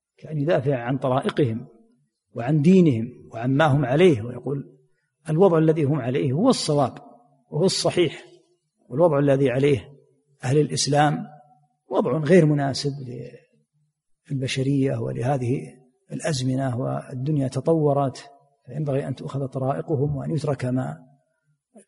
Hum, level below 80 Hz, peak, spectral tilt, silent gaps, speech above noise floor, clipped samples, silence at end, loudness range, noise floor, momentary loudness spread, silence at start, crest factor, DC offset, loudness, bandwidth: none; -58 dBFS; -4 dBFS; -6.5 dB/octave; none; 49 dB; under 0.1%; 0.1 s; 5 LU; -71 dBFS; 15 LU; 0.25 s; 18 dB; under 0.1%; -22 LUFS; 11.5 kHz